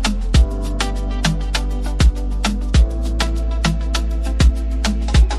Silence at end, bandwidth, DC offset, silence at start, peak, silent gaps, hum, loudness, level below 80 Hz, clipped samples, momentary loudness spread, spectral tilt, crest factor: 0 s; 12 kHz; under 0.1%; 0 s; -4 dBFS; none; none; -19 LUFS; -18 dBFS; under 0.1%; 5 LU; -5 dB/octave; 14 dB